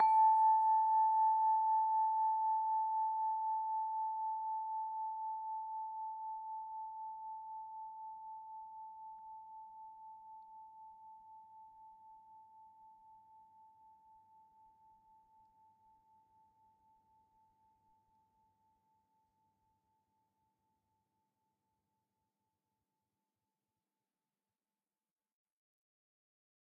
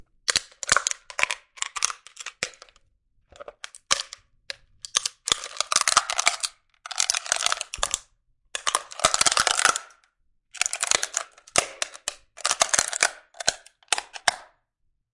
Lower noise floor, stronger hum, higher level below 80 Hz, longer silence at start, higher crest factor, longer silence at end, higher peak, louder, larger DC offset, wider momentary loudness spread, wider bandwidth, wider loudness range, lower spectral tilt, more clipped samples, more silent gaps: first, under -90 dBFS vs -73 dBFS; neither; second, -88 dBFS vs -56 dBFS; second, 0 s vs 0.3 s; second, 20 dB vs 28 dB; first, 13.85 s vs 0.7 s; second, -20 dBFS vs 0 dBFS; second, -35 LUFS vs -24 LUFS; neither; first, 25 LU vs 16 LU; second, 3 kHz vs 11.5 kHz; first, 25 LU vs 7 LU; second, 4 dB/octave vs 1.5 dB/octave; neither; neither